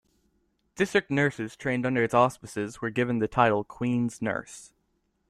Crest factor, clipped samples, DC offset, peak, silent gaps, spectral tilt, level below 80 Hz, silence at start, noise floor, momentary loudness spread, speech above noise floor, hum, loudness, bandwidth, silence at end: 20 dB; under 0.1%; under 0.1%; -8 dBFS; none; -6 dB/octave; -60 dBFS; 0.75 s; -73 dBFS; 11 LU; 47 dB; none; -27 LUFS; 13.5 kHz; 0.65 s